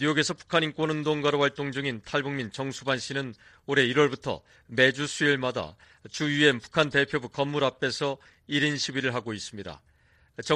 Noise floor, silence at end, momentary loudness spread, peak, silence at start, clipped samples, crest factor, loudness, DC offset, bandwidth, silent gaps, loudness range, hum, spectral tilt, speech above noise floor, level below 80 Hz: -56 dBFS; 0 s; 15 LU; -6 dBFS; 0 s; under 0.1%; 22 dB; -27 LUFS; under 0.1%; 11 kHz; none; 3 LU; none; -4.5 dB/octave; 28 dB; -62 dBFS